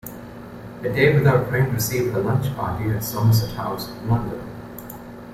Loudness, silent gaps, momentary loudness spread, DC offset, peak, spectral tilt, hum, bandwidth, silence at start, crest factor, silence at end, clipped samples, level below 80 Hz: -21 LUFS; none; 19 LU; under 0.1%; -4 dBFS; -6 dB/octave; none; 16 kHz; 0.05 s; 18 dB; 0 s; under 0.1%; -46 dBFS